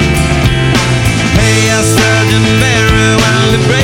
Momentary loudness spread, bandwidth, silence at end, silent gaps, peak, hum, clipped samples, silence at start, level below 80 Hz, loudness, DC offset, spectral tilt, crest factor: 2 LU; 17 kHz; 0 s; none; 0 dBFS; none; under 0.1%; 0 s; -20 dBFS; -9 LUFS; under 0.1%; -4.5 dB/octave; 8 dB